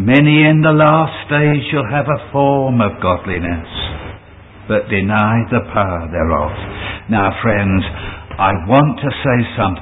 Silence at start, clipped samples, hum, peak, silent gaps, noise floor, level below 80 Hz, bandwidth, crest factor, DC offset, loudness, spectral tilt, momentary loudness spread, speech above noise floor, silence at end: 0 s; under 0.1%; none; 0 dBFS; none; -38 dBFS; -32 dBFS; 4 kHz; 14 dB; under 0.1%; -15 LUFS; -10 dB/octave; 13 LU; 24 dB; 0 s